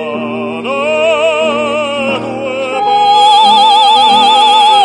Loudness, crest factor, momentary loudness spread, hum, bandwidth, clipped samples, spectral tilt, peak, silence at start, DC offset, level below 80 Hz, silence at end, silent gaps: -9 LUFS; 10 dB; 12 LU; none; 11 kHz; 0.1%; -2.5 dB/octave; 0 dBFS; 0 s; under 0.1%; -54 dBFS; 0 s; none